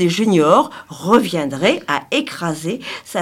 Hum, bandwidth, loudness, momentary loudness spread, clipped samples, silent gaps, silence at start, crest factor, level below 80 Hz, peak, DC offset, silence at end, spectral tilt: none; 16.5 kHz; -17 LUFS; 12 LU; under 0.1%; none; 0 s; 16 dB; -62 dBFS; 0 dBFS; under 0.1%; 0 s; -5 dB/octave